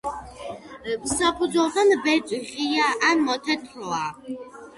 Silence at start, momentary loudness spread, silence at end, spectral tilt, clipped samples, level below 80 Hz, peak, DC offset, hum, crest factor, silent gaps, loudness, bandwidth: 0.05 s; 17 LU; 0.05 s; -2.5 dB/octave; under 0.1%; -54 dBFS; -8 dBFS; under 0.1%; none; 16 dB; none; -23 LUFS; 11.5 kHz